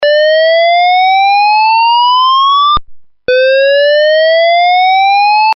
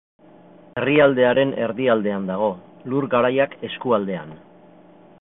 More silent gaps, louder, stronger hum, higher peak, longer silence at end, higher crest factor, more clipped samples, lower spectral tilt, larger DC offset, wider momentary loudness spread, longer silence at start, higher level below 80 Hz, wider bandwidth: neither; first, -7 LUFS vs -20 LUFS; neither; about the same, -4 dBFS vs -4 dBFS; second, 0 s vs 0.85 s; second, 2 dB vs 18 dB; neither; second, 3.5 dB/octave vs -11 dB/octave; neither; second, 2 LU vs 14 LU; second, 0 s vs 0.75 s; first, -40 dBFS vs -60 dBFS; first, 5.8 kHz vs 4 kHz